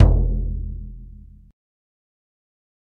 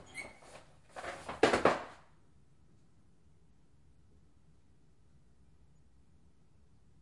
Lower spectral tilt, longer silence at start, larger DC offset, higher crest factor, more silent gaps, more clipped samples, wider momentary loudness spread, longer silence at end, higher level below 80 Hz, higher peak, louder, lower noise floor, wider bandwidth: first, -10.5 dB/octave vs -4 dB/octave; about the same, 0 s vs 0 s; neither; second, 22 dB vs 32 dB; neither; neither; second, 24 LU vs 28 LU; second, 1.85 s vs 5.1 s; first, -24 dBFS vs -66 dBFS; first, 0 dBFS vs -10 dBFS; first, -23 LUFS vs -34 LUFS; second, -42 dBFS vs -68 dBFS; second, 2.2 kHz vs 11.5 kHz